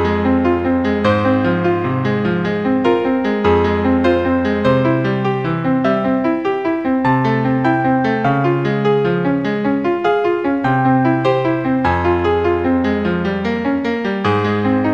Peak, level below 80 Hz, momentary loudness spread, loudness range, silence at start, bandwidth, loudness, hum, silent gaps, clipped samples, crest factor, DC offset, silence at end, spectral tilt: -2 dBFS; -40 dBFS; 4 LU; 1 LU; 0 s; 6.8 kHz; -16 LUFS; none; none; under 0.1%; 14 dB; 0.2%; 0 s; -8.5 dB/octave